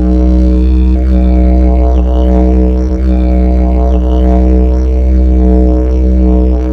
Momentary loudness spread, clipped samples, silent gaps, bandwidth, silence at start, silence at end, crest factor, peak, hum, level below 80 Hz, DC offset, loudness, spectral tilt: 2 LU; under 0.1%; none; 3.6 kHz; 0 s; 0 s; 6 dB; 0 dBFS; none; -8 dBFS; under 0.1%; -10 LUFS; -10.5 dB/octave